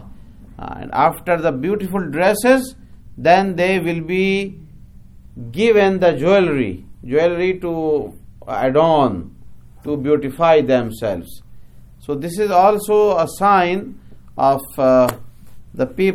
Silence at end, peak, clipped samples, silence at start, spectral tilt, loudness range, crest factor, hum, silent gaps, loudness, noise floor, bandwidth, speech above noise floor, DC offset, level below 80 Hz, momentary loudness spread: 0 s; 0 dBFS; under 0.1%; 0 s; -6 dB/octave; 2 LU; 18 dB; none; none; -17 LUFS; -40 dBFS; 17 kHz; 24 dB; under 0.1%; -44 dBFS; 16 LU